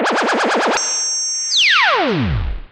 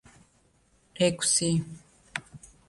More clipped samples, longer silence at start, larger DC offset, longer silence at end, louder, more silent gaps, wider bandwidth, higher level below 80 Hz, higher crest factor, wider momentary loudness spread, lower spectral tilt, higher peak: neither; second, 0 s vs 0.95 s; neither; second, 0.05 s vs 0.3 s; first, -15 LUFS vs -27 LUFS; neither; about the same, 12 kHz vs 11.5 kHz; first, -30 dBFS vs -60 dBFS; second, 14 dB vs 20 dB; second, 8 LU vs 16 LU; second, -2 dB/octave vs -3.5 dB/octave; first, -4 dBFS vs -12 dBFS